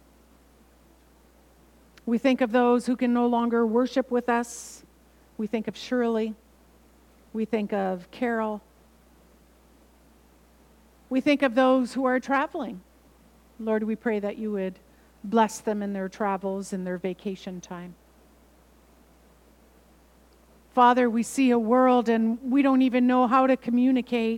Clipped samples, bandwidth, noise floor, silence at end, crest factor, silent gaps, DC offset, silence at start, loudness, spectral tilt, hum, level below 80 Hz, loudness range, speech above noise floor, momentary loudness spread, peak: under 0.1%; 13.5 kHz; -57 dBFS; 0 s; 20 dB; none; under 0.1%; 2.05 s; -25 LUFS; -5.5 dB/octave; none; -62 dBFS; 12 LU; 33 dB; 15 LU; -6 dBFS